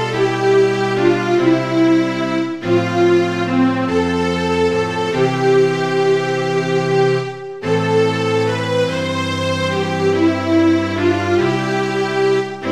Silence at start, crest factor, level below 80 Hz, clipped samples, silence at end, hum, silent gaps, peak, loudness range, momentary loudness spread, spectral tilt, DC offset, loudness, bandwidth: 0 s; 14 dB; -50 dBFS; under 0.1%; 0 s; none; none; -2 dBFS; 2 LU; 5 LU; -6 dB/octave; 0.4%; -16 LUFS; 12 kHz